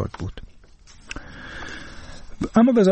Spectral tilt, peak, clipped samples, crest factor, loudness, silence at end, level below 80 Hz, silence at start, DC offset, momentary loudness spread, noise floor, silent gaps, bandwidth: -7 dB/octave; -4 dBFS; under 0.1%; 20 dB; -22 LUFS; 0 s; -42 dBFS; 0 s; under 0.1%; 25 LU; -47 dBFS; none; 8.4 kHz